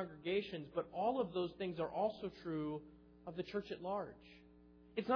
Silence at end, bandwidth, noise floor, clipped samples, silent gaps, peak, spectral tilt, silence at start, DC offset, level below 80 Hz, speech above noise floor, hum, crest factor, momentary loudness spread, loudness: 0 s; 5.4 kHz; -63 dBFS; under 0.1%; none; -24 dBFS; -4.5 dB/octave; 0 s; under 0.1%; -70 dBFS; 22 dB; none; 18 dB; 14 LU; -42 LUFS